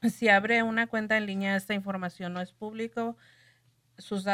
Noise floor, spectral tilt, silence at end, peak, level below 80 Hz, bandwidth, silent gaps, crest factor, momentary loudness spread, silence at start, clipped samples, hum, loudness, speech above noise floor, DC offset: -66 dBFS; -5.5 dB/octave; 0 s; -10 dBFS; -72 dBFS; 15.5 kHz; none; 20 dB; 14 LU; 0 s; under 0.1%; none; -28 LUFS; 37 dB; under 0.1%